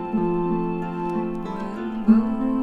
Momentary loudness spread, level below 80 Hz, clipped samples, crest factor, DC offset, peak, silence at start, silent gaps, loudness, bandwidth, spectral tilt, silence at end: 11 LU; -46 dBFS; under 0.1%; 18 dB; under 0.1%; -6 dBFS; 0 s; none; -24 LUFS; 4.7 kHz; -9.5 dB/octave; 0 s